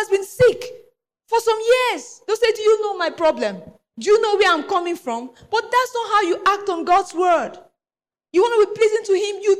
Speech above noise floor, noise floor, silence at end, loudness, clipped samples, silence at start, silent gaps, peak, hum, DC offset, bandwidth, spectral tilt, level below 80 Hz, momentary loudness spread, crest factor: over 72 dB; under -90 dBFS; 0 s; -19 LUFS; under 0.1%; 0 s; none; -8 dBFS; none; under 0.1%; 15 kHz; -3.5 dB/octave; -56 dBFS; 10 LU; 12 dB